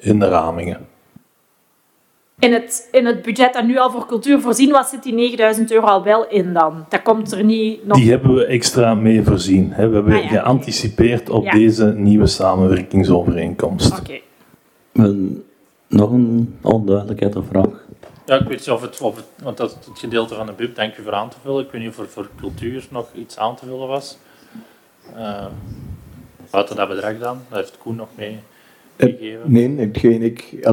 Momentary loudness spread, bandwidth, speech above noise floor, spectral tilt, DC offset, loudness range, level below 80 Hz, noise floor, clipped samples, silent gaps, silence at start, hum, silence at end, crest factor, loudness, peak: 17 LU; 16.5 kHz; 44 dB; -6 dB/octave; under 0.1%; 12 LU; -40 dBFS; -60 dBFS; under 0.1%; none; 0.05 s; none; 0 s; 16 dB; -16 LUFS; 0 dBFS